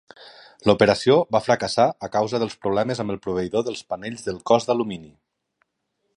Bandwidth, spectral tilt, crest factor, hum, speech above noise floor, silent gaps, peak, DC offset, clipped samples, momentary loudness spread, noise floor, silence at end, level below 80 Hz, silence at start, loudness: 11 kHz; -5.5 dB/octave; 22 dB; none; 53 dB; none; -2 dBFS; under 0.1%; under 0.1%; 13 LU; -75 dBFS; 1.1 s; -56 dBFS; 0.2 s; -22 LUFS